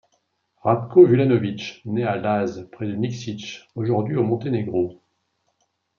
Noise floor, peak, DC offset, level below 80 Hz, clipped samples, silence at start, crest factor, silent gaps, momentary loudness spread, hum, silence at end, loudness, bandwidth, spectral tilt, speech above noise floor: -71 dBFS; -2 dBFS; under 0.1%; -66 dBFS; under 0.1%; 0.65 s; 20 dB; none; 17 LU; none; 1.05 s; -21 LUFS; 7 kHz; -8 dB/octave; 51 dB